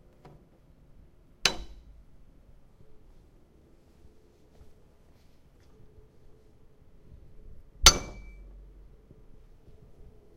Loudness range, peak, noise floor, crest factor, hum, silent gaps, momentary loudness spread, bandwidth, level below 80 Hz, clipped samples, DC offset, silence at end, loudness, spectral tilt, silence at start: 9 LU; 0 dBFS; -58 dBFS; 36 dB; none; none; 32 LU; 16 kHz; -44 dBFS; under 0.1%; under 0.1%; 2.15 s; -23 LUFS; -0.5 dB/octave; 1.45 s